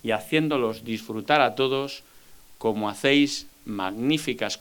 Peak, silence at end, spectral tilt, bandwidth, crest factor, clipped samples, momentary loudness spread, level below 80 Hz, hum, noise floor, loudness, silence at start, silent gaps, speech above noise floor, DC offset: -4 dBFS; 0 s; -4.5 dB/octave; 19.5 kHz; 22 dB; under 0.1%; 12 LU; -60 dBFS; none; -50 dBFS; -25 LUFS; 0.05 s; none; 26 dB; under 0.1%